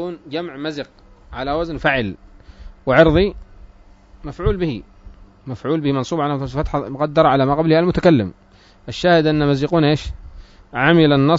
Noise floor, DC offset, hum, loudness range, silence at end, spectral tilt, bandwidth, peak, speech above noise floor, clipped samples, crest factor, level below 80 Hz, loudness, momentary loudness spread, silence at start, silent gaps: -46 dBFS; under 0.1%; none; 6 LU; 0 s; -7.5 dB/octave; 7.8 kHz; 0 dBFS; 29 dB; under 0.1%; 18 dB; -36 dBFS; -18 LUFS; 18 LU; 0 s; none